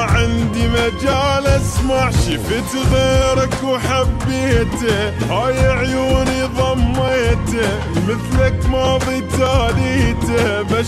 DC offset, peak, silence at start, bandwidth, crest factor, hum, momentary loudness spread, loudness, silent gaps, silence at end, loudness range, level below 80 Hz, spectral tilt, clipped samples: under 0.1%; -2 dBFS; 0 s; 14 kHz; 12 dB; none; 3 LU; -16 LUFS; none; 0 s; 1 LU; -24 dBFS; -5.5 dB/octave; under 0.1%